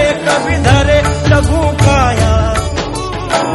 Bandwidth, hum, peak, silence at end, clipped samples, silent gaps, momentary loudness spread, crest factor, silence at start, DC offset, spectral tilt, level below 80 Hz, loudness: 12 kHz; none; 0 dBFS; 0 s; under 0.1%; none; 8 LU; 12 dB; 0 s; under 0.1%; -5.5 dB/octave; -20 dBFS; -12 LUFS